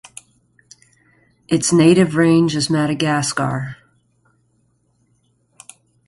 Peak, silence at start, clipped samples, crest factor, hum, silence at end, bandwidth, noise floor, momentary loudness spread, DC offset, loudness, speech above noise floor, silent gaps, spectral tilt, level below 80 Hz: -2 dBFS; 1.5 s; under 0.1%; 18 dB; 60 Hz at -45 dBFS; 2.35 s; 11.5 kHz; -62 dBFS; 12 LU; under 0.1%; -16 LUFS; 47 dB; none; -5 dB/octave; -56 dBFS